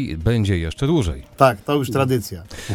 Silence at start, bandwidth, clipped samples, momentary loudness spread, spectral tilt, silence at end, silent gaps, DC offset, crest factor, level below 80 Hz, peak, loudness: 0 s; 18 kHz; under 0.1%; 9 LU; -6.5 dB/octave; 0 s; none; under 0.1%; 20 dB; -36 dBFS; 0 dBFS; -20 LUFS